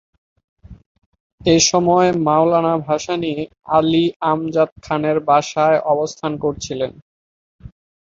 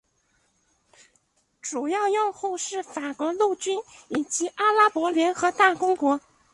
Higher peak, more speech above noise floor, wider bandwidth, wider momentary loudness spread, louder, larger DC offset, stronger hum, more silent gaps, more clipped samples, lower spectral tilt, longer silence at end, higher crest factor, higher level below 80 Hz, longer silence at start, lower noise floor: about the same, -2 dBFS vs -4 dBFS; first, over 73 dB vs 45 dB; second, 7.8 kHz vs 11.5 kHz; about the same, 10 LU vs 11 LU; first, -17 LUFS vs -24 LUFS; neither; neither; first, 0.86-0.95 s, 1.06-1.12 s, 1.20-1.38 s, 4.16-4.20 s, 4.72-4.76 s, 7.02-7.59 s vs none; neither; first, -4.5 dB/octave vs -2 dB/octave; about the same, 0.35 s vs 0.35 s; second, 16 dB vs 22 dB; first, -50 dBFS vs -72 dBFS; second, 0.7 s vs 1.65 s; first, under -90 dBFS vs -68 dBFS